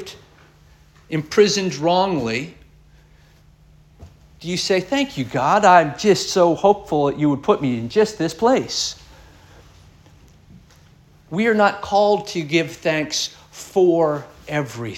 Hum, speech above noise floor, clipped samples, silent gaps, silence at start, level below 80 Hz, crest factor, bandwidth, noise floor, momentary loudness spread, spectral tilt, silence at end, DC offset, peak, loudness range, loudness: none; 32 dB; under 0.1%; none; 0 s; -52 dBFS; 20 dB; 16.5 kHz; -51 dBFS; 11 LU; -4.5 dB/octave; 0 s; under 0.1%; -2 dBFS; 8 LU; -19 LUFS